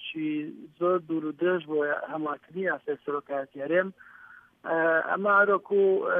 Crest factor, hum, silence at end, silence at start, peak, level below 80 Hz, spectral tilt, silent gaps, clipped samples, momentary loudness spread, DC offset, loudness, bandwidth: 18 dB; none; 0 s; 0 s; -10 dBFS; -80 dBFS; -8.5 dB/octave; none; under 0.1%; 11 LU; under 0.1%; -27 LUFS; 3.7 kHz